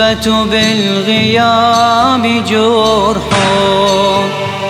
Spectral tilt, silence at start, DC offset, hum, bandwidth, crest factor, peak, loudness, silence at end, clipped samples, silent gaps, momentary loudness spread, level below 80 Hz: -4.5 dB/octave; 0 s; 0.1%; none; 16 kHz; 10 dB; 0 dBFS; -10 LUFS; 0 s; under 0.1%; none; 3 LU; -36 dBFS